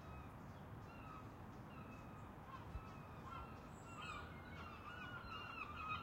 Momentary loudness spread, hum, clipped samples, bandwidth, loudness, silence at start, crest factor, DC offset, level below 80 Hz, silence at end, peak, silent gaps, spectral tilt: 6 LU; none; under 0.1%; 16 kHz; -53 LUFS; 0 s; 18 dB; under 0.1%; -64 dBFS; 0 s; -36 dBFS; none; -5.5 dB/octave